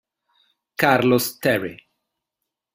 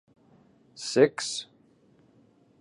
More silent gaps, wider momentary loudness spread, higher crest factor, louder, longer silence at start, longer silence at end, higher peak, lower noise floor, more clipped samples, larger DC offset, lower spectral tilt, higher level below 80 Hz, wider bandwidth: neither; about the same, 15 LU vs 16 LU; about the same, 22 dB vs 24 dB; first, -19 LUFS vs -26 LUFS; about the same, 0.8 s vs 0.75 s; second, 1 s vs 1.15 s; first, -2 dBFS vs -6 dBFS; first, -83 dBFS vs -61 dBFS; neither; neither; first, -5 dB/octave vs -3.5 dB/octave; first, -60 dBFS vs -78 dBFS; first, 16 kHz vs 11 kHz